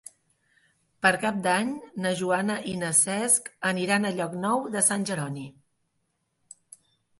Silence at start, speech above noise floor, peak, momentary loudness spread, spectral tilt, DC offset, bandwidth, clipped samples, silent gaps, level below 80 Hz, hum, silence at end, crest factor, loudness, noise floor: 1 s; 50 dB; -6 dBFS; 10 LU; -3 dB/octave; under 0.1%; 12 kHz; under 0.1%; none; -68 dBFS; none; 1.7 s; 22 dB; -25 LUFS; -76 dBFS